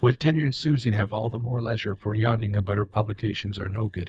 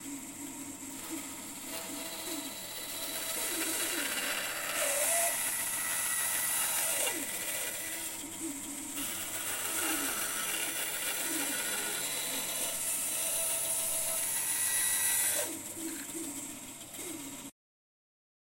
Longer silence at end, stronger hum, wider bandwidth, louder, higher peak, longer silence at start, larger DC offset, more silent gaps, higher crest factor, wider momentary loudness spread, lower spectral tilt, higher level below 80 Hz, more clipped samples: second, 0 s vs 1 s; neither; second, 7.8 kHz vs 16.5 kHz; first, -26 LUFS vs -32 LUFS; first, -8 dBFS vs -16 dBFS; about the same, 0 s vs 0 s; neither; neither; about the same, 18 dB vs 18 dB; second, 6 LU vs 13 LU; first, -7.5 dB/octave vs 0 dB/octave; first, -52 dBFS vs -68 dBFS; neither